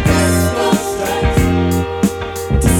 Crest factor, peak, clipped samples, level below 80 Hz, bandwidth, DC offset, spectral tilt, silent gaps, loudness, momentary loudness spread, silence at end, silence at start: 14 dB; 0 dBFS; under 0.1%; -22 dBFS; 18 kHz; under 0.1%; -5.5 dB/octave; none; -15 LUFS; 5 LU; 0 s; 0 s